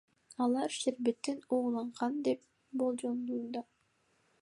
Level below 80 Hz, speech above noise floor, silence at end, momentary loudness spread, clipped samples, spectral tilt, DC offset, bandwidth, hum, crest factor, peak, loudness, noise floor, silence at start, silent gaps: -86 dBFS; 40 dB; 0.8 s; 8 LU; under 0.1%; -4 dB/octave; under 0.1%; 11.5 kHz; none; 16 dB; -18 dBFS; -35 LUFS; -74 dBFS; 0.3 s; none